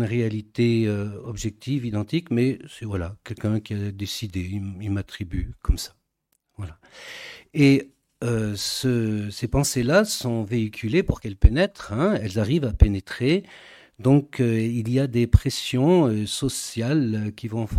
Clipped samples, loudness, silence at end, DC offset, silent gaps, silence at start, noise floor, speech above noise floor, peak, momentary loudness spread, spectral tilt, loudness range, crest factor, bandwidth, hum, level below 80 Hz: under 0.1%; -24 LUFS; 0 s; under 0.1%; none; 0 s; -73 dBFS; 50 dB; 0 dBFS; 12 LU; -6 dB/octave; 8 LU; 22 dB; 16 kHz; none; -32 dBFS